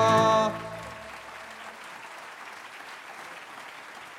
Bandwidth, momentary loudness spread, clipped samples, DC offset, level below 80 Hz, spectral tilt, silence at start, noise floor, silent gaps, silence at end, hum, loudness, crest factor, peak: 15.5 kHz; 19 LU; under 0.1%; under 0.1%; -64 dBFS; -4.5 dB/octave; 0 s; -44 dBFS; none; 0 s; none; -26 LUFS; 22 dB; -8 dBFS